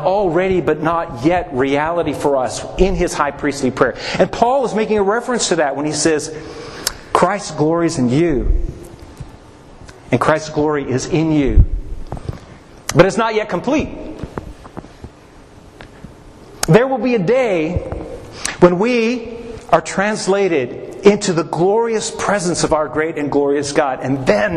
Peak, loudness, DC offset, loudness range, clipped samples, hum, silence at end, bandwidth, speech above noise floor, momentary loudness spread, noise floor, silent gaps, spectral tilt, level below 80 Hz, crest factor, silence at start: 0 dBFS; -16 LUFS; under 0.1%; 4 LU; under 0.1%; none; 0 s; 13 kHz; 26 dB; 16 LU; -41 dBFS; none; -5 dB/octave; -28 dBFS; 16 dB; 0 s